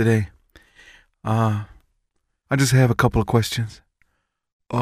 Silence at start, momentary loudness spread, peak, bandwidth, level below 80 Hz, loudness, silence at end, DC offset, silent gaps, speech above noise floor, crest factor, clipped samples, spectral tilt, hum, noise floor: 0 s; 16 LU; -4 dBFS; 15.5 kHz; -42 dBFS; -21 LUFS; 0 s; under 0.1%; 4.53-4.60 s; 54 dB; 18 dB; under 0.1%; -6 dB/octave; none; -73 dBFS